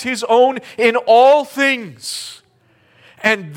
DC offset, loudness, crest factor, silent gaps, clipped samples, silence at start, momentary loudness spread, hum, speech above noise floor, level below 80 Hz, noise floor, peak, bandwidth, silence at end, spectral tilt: under 0.1%; -14 LUFS; 16 dB; none; under 0.1%; 0 s; 15 LU; none; 41 dB; -68 dBFS; -56 dBFS; 0 dBFS; 16.5 kHz; 0 s; -3 dB/octave